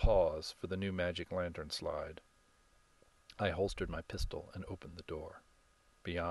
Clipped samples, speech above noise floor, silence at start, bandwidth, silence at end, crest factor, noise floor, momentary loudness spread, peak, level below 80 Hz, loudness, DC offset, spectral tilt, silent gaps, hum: under 0.1%; 31 dB; 0 s; 12 kHz; 0 s; 22 dB; -69 dBFS; 13 LU; -16 dBFS; -46 dBFS; -40 LUFS; under 0.1%; -5.5 dB/octave; none; none